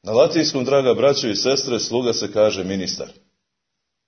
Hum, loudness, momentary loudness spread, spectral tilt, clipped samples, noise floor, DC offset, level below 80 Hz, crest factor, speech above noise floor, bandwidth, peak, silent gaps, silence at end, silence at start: none; -19 LUFS; 8 LU; -4 dB/octave; under 0.1%; -79 dBFS; under 0.1%; -60 dBFS; 18 dB; 60 dB; 6.6 kHz; -2 dBFS; none; 0.95 s; 0.05 s